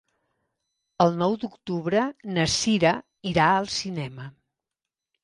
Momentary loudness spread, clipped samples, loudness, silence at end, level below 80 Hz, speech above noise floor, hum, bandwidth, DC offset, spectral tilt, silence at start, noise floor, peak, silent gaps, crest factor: 12 LU; under 0.1%; -24 LUFS; 0.95 s; -56 dBFS; 64 dB; none; 11.5 kHz; under 0.1%; -4.5 dB/octave; 1 s; -88 dBFS; -6 dBFS; none; 22 dB